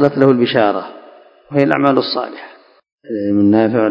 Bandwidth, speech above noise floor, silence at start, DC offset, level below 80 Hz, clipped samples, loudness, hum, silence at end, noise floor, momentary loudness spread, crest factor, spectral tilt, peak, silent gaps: 5.4 kHz; 29 dB; 0 s; under 0.1%; -56 dBFS; 0.1%; -14 LUFS; none; 0 s; -43 dBFS; 15 LU; 16 dB; -8.5 dB/octave; 0 dBFS; 2.92-2.98 s